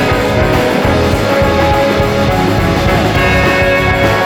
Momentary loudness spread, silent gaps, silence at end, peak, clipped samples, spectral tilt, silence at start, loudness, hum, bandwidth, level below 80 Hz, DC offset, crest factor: 2 LU; none; 0 s; 0 dBFS; under 0.1%; -6 dB/octave; 0 s; -11 LUFS; none; 19.5 kHz; -22 dBFS; under 0.1%; 10 dB